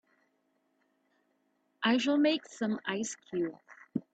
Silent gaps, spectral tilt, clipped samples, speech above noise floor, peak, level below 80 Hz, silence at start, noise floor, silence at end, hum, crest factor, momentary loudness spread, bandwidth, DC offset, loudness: none; -4 dB/octave; under 0.1%; 45 dB; -16 dBFS; -80 dBFS; 1.8 s; -76 dBFS; 0.15 s; none; 18 dB; 11 LU; 9 kHz; under 0.1%; -32 LUFS